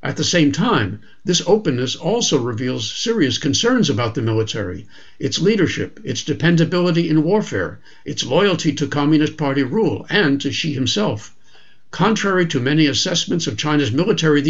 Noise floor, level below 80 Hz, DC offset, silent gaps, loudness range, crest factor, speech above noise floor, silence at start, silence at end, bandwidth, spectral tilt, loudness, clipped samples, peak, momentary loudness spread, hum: -53 dBFS; -52 dBFS; 1%; none; 1 LU; 16 dB; 35 dB; 0.05 s; 0 s; 8 kHz; -4.5 dB/octave; -18 LUFS; under 0.1%; -2 dBFS; 9 LU; none